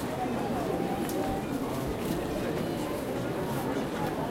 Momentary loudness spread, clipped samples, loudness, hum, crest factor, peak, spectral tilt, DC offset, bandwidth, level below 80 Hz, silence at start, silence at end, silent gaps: 2 LU; under 0.1%; -32 LUFS; none; 14 dB; -18 dBFS; -6 dB/octave; under 0.1%; 16 kHz; -48 dBFS; 0 s; 0 s; none